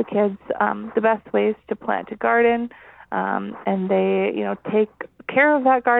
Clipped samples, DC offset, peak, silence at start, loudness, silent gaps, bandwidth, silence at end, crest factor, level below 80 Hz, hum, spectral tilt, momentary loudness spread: under 0.1%; under 0.1%; -4 dBFS; 0 s; -21 LUFS; none; 4 kHz; 0 s; 18 dB; -62 dBFS; none; -9.5 dB/octave; 9 LU